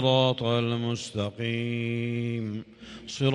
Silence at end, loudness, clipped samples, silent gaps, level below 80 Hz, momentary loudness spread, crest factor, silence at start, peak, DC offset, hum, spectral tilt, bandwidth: 0 s; -28 LUFS; under 0.1%; none; -62 dBFS; 15 LU; 20 dB; 0 s; -8 dBFS; under 0.1%; none; -6 dB/octave; 10.5 kHz